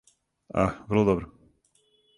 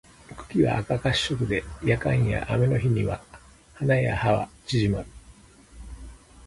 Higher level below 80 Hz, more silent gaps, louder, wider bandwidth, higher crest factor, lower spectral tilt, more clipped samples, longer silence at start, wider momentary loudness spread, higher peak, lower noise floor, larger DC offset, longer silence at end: second, -48 dBFS vs -42 dBFS; neither; about the same, -26 LUFS vs -25 LUFS; about the same, 10.5 kHz vs 11.5 kHz; about the same, 22 dB vs 18 dB; first, -8 dB/octave vs -6.5 dB/octave; neither; first, 0.55 s vs 0.3 s; second, 9 LU vs 21 LU; about the same, -8 dBFS vs -8 dBFS; first, -67 dBFS vs -51 dBFS; neither; first, 0.9 s vs 0 s